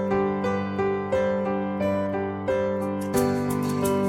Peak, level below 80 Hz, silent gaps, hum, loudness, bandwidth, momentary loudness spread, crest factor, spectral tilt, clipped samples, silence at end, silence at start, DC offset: -10 dBFS; -54 dBFS; none; none; -25 LUFS; 16 kHz; 3 LU; 14 dB; -6.5 dB/octave; under 0.1%; 0 s; 0 s; under 0.1%